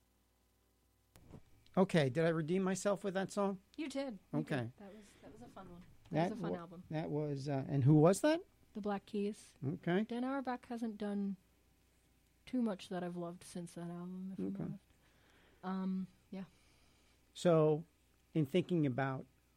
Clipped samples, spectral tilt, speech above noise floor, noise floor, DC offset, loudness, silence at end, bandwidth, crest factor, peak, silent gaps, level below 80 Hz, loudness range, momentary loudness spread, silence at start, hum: under 0.1%; -7 dB/octave; 38 dB; -75 dBFS; under 0.1%; -38 LUFS; 0.35 s; 15 kHz; 20 dB; -18 dBFS; none; -72 dBFS; 10 LU; 18 LU; 1.15 s; none